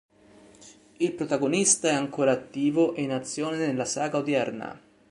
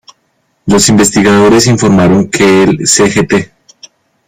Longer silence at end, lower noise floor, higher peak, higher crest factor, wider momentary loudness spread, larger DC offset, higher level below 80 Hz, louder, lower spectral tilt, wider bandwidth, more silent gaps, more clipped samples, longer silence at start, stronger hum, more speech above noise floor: second, 0.35 s vs 0.85 s; second, -54 dBFS vs -58 dBFS; second, -8 dBFS vs 0 dBFS; first, 20 dB vs 8 dB; about the same, 9 LU vs 7 LU; neither; second, -68 dBFS vs -38 dBFS; second, -26 LUFS vs -7 LUFS; about the same, -3.5 dB/octave vs -4.5 dB/octave; second, 11.5 kHz vs 16 kHz; neither; neither; about the same, 0.6 s vs 0.65 s; neither; second, 28 dB vs 52 dB